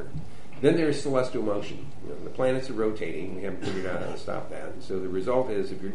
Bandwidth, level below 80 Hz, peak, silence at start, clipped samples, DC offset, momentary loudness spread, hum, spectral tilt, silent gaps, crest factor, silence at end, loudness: 11 kHz; -54 dBFS; -6 dBFS; 0 s; under 0.1%; 4%; 15 LU; none; -6.5 dB/octave; none; 22 dB; 0 s; -29 LUFS